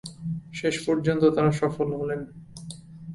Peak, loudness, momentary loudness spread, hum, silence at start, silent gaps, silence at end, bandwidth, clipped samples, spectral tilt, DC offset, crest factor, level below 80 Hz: -8 dBFS; -25 LUFS; 20 LU; none; 0.05 s; none; 0 s; 11.5 kHz; under 0.1%; -6.5 dB/octave; under 0.1%; 18 dB; -56 dBFS